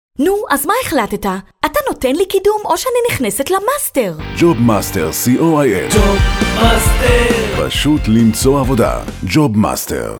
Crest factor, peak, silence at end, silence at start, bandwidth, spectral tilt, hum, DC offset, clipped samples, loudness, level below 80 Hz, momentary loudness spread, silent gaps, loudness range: 14 dB; 0 dBFS; 0 s; 0.2 s; over 20 kHz; -5 dB/octave; none; under 0.1%; under 0.1%; -14 LUFS; -24 dBFS; 5 LU; none; 3 LU